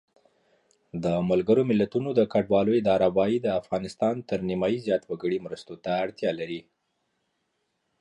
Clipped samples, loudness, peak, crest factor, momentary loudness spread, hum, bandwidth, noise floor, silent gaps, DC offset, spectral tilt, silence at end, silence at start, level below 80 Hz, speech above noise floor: under 0.1%; -26 LUFS; -10 dBFS; 18 dB; 10 LU; none; 11 kHz; -76 dBFS; none; under 0.1%; -7.5 dB/octave; 1.4 s; 0.95 s; -60 dBFS; 51 dB